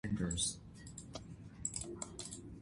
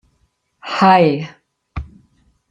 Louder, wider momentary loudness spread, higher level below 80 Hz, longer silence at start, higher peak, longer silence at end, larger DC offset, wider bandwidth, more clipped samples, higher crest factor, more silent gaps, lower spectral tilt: second, -42 LUFS vs -14 LUFS; second, 15 LU vs 22 LU; second, -56 dBFS vs -40 dBFS; second, 0.05 s vs 0.65 s; second, -22 dBFS vs -2 dBFS; second, 0 s vs 0.65 s; neither; first, 11.5 kHz vs 8.8 kHz; neither; about the same, 20 dB vs 18 dB; neither; second, -3.5 dB/octave vs -7 dB/octave